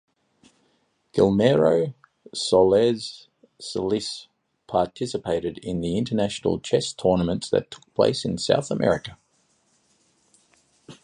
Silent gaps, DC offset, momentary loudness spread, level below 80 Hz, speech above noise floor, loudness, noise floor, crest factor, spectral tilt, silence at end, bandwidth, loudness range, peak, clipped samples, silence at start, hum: none; under 0.1%; 14 LU; -52 dBFS; 45 dB; -23 LUFS; -68 dBFS; 20 dB; -5.5 dB/octave; 0.1 s; 11 kHz; 5 LU; -4 dBFS; under 0.1%; 1.15 s; none